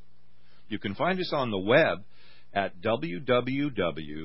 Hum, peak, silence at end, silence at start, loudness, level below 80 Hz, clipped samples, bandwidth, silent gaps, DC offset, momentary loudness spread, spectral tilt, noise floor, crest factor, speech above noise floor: none; -8 dBFS; 0 s; 0.7 s; -28 LUFS; -58 dBFS; under 0.1%; 5.8 kHz; none; 1%; 12 LU; -10 dB/octave; -65 dBFS; 20 dB; 37 dB